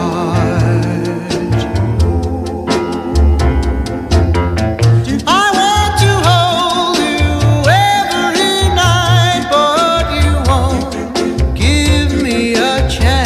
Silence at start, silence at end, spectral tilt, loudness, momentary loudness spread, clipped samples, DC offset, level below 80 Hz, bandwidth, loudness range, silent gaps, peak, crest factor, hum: 0 s; 0 s; -5 dB/octave; -12 LUFS; 7 LU; under 0.1%; under 0.1%; -20 dBFS; 15.5 kHz; 4 LU; none; 0 dBFS; 12 dB; none